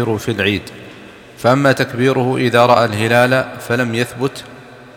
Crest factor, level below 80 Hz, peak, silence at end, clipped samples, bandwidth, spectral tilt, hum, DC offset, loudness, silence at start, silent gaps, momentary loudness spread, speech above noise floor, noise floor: 16 dB; -54 dBFS; 0 dBFS; 0.1 s; under 0.1%; 17 kHz; -5.5 dB/octave; none; under 0.1%; -15 LUFS; 0 s; none; 11 LU; 23 dB; -37 dBFS